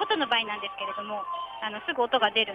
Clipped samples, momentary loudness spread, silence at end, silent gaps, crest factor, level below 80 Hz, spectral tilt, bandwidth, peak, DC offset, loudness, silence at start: under 0.1%; 10 LU; 0 s; none; 18 dB; -70 dBFS; -4.5 dB/octave; 9.8 kHz; -10 dBFS; under 0.1%; -28 LUFS; 0 s